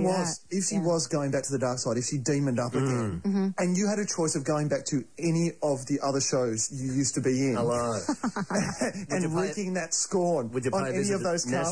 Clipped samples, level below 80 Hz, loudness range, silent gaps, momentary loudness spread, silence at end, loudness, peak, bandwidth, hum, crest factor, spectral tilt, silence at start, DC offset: under 0.1%; -60 dBFS; 1 LU; none; 4 LU; 0 s; -28 LUFS; -14 dBFS; 10.5 kHz; none; 12 dB; -5 dB/octave; 0 s; 0.2%